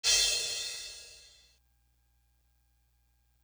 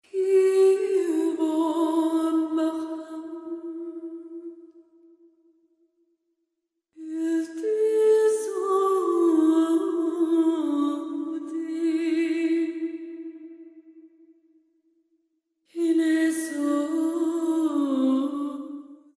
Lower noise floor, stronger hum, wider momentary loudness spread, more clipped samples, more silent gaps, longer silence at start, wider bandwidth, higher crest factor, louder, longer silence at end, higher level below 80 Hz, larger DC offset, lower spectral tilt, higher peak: second, -71 dBFS vs -81 dBFS; first, 60 Hz at -70 dBFS vs none; first, 23 LU vs 17 LU; neither; neither; about the same, 0.05 s vs 0.15 s; first, over 20 kHz vs 12.5 kHz; first, 24 dB vs 14 dB; second, -29 LUFS vs -24 LUFS; first, 2.25 s vs 0.25 s; first, -62 dBFS vs -82 dBFS; neither; second, 2.5 dB/octave vs -3.5 dB/octave; about the same, -12 dBFS vs -12 dBFS